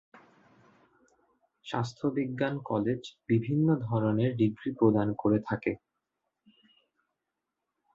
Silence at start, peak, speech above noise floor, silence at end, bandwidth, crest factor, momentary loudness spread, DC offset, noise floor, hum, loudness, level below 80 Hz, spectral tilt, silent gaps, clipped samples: 0.15 s; -10 dBFS; 57 dB; 2.2 s; 7.6 kHz; 22 dB; 9 LU; under 0.1%; -86 dBFS; none; -29 LUFS; -64 dBFS; -8.5 dB/octave; none; under 0.1%